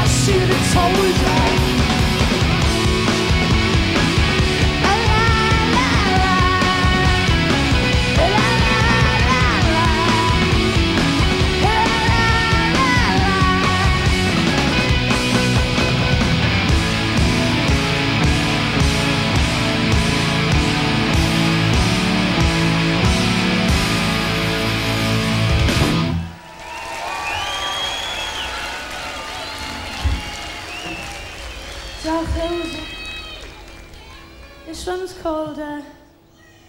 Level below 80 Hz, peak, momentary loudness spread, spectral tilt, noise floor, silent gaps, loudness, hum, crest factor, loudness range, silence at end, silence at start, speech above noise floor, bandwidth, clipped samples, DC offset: -26 dBFS; -2 dBFS; 12 LU; -4.5 dB/octave; -48 dBFS; none; -17 LUFS; none; 14 dB; 11 LU; 0.75 s; 0 s; 34 dB; 16 kHz; under 0.1%; under 0.1%